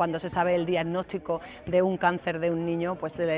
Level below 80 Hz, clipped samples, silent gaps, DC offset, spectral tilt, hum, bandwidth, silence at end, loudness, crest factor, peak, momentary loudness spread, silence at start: -56 dBFS; under 0.1%; none; under 0.1%; -10.5 dB/octave; none; 4 kHz; 0 s; -28 LUFS; 18 dB; -10 dBFS; 7 LU; 0 s